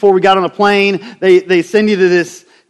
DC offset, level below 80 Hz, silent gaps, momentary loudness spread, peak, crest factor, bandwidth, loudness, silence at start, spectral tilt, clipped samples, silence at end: under 0.1%; -58 dBFS; none; 5 LU; 0 dBFS; 12 dB; 12 kHz; -11 LUFS; 0 s; -5.5 dB/octave; 0.2%; 0.3 s